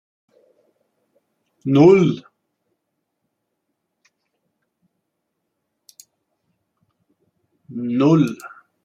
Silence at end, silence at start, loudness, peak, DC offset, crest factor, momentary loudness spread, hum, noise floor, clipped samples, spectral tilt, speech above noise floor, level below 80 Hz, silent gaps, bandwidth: 0.35 s; 1.65 s; -16 LUFS; -2 dBFS; under 0.1%; 20 dB; 23 LU; none; -76 dBFS; under 0.1%; -8 dB/octave; 61 dB; -64 dBFS; none; 12.5 kHz